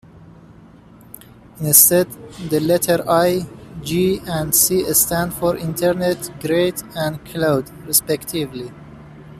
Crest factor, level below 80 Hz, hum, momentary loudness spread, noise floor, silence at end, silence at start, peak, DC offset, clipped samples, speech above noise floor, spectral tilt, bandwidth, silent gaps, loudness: 20 dB; -48 dBFS; none; 13 LU; -44 dBFS; 0 s; 0.15 s; 0 dBFS; under 0.1%; under 0.1%; 26 dB; -3.5 dB/octave; 15.5 kHz; none; -17 LUFS